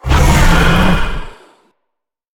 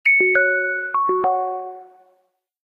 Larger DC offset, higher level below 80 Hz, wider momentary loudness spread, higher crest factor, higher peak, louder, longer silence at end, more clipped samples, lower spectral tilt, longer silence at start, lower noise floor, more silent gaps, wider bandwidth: neither; first, -16 dBFS vs -70 dBFS; about the same, 13 LU vs 15 LU; about the same, 12 dB vs 16 dB; first, 0 dBFS vs -6 dBFS; first, -12 LUFS vs -18 LUFS; first, 1.05 s vs 0.85 s; neither; about the same, -5 dB/octave vs -6 dB/octave; about the same, 0.05 s vs 0.05 s; first, -75 dBFS vs -66 dBFS; neither; first, 18 kHz vs 5 kHz